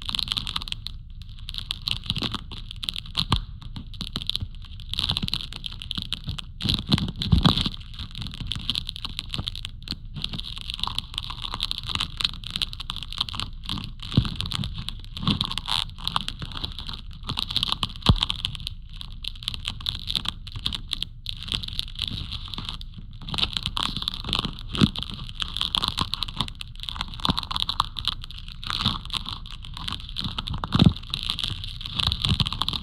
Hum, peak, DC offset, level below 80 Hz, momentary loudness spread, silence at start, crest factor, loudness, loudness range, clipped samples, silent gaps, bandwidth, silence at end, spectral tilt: none; -4 dBFS; under 0.1%; -36 dBFS; 12 LU; 0 s; 26 dB; -27 LUFS; 4 LU; under 0.1%; none; 16 kHz; 0 s; -4.5 dB/octave